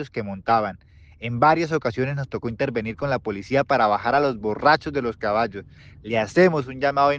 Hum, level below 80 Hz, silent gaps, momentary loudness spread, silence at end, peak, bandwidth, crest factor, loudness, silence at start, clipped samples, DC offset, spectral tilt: none; -52 dBFS; none; 11 LU; 0 s; -4 dBFS; 8.4 kHz; 18 dB; -22 LUFS; 0 s; under 0.1%; under 0.1%; -6.5 dB/octave